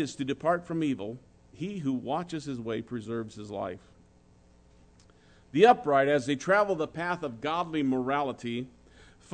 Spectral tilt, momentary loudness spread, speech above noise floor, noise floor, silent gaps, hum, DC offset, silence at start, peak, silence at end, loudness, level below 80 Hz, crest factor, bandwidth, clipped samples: -6 dB/octave; 15 LU; 31 dB; -59 dBFS; none; none; under 0.1%; 0 s; -8 dBFS; 0.3 s; -29 LUFS; -62 dBFS; 22 dB; 9.4 kHz; under 0.1%